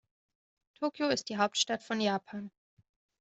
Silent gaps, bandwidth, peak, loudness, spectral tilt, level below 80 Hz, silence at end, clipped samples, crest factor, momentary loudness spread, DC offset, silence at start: none; 8.2 kHz; -14 dBFS; -32 LUFS; -3 dB/octave; -76 dBFS; 0.7 s; under 0.1%; 22 dB; 15 LU; under 0.1%; 0.8 s